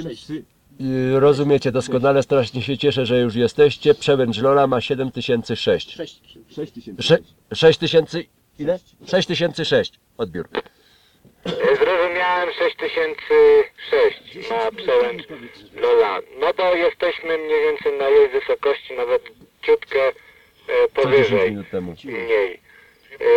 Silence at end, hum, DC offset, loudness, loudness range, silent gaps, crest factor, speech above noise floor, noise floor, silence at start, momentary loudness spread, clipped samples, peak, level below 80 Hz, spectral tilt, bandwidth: 0 s; none; under 0.1%; -19 LUFS; 4 LU; none; 18 dB; 35 dB; -54 dBFS; 0 s; 14 LU; under 0.1%; -2 dBFS; -52 dBFS; -5.5 dB/octave; 9.8 kHz